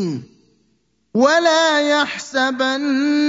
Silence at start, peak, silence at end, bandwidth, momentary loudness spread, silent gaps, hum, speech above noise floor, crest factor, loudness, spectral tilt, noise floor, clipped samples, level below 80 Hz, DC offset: 0 s; -2 dBFS; 0 s; 7.8 kHz; 10 LU; none; none; 47 dB; 16 dB; -17 LUFS; -3.5 dB/octave; -64 dBFS; under 0.1%; -68 dBFS; under 0.1%